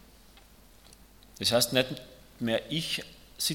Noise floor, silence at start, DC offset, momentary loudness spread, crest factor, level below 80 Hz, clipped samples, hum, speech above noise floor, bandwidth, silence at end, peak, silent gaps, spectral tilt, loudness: -55 dBFS; 0.35 s; under 0.1%; 12 LU; 24 dB; -60 dBFS; under 0.1%; none; 26 dB; 17.5 kHz; 0 s; -8 dBFS; none; -3 dB/octave; -29 LUFS